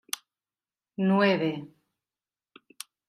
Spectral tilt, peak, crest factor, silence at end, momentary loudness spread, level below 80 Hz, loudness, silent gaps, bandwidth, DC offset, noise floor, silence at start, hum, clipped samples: -5.5 dB/octave; -10 dBFS; 22 dB; 1.4 s; 21 LU; -80 dBFS; -26 LUFS; none; 15.5 kHz; under 0.1%; under -90 dBFS; 1 s; none; under 0.1%